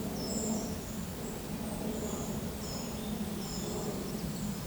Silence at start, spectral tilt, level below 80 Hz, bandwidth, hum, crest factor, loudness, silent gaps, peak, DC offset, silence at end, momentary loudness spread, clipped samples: 0 s; -5 dB/octave; -50 dBFS; over 20 kHz; none; 14 dB; -37 LUFS; none; -22 dBFS; under 0.1%; 0 s; 4 LU; under 0.1%